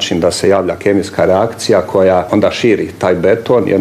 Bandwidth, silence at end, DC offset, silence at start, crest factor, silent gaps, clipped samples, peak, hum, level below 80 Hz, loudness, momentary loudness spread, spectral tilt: 14.5 kHz; 0 s; under 0.1%; 0 s; 12 dB; none; under 0.1%; 0 dBFS; none; -50 dBFS; -12 LUFS; 3 LU; -5 dB/octave